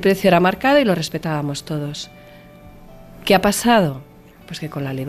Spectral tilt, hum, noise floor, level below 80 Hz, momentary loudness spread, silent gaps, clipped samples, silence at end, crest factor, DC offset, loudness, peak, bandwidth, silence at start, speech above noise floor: -5 dB/octave; none; -42 dBFS; -46 dBFS; 16 LU; none; under 0.1%; 0 s; 16 dB; under 0.1%; -18 LUFS; -4 dBFS; 15 kHz; 0 s; 24 dB